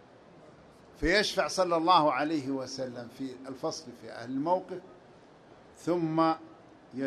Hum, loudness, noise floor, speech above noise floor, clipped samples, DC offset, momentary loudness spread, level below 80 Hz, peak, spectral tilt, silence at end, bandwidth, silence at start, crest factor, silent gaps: none; -30 LUFS; -55 dBFS; 26 dB; under 0.1%; under 0.1%; 18 LU; -54 dBFS; -10 dBFS; -4.5 dB/octave; 0 s; 13 kHz; 0.35 s; 22 dB; none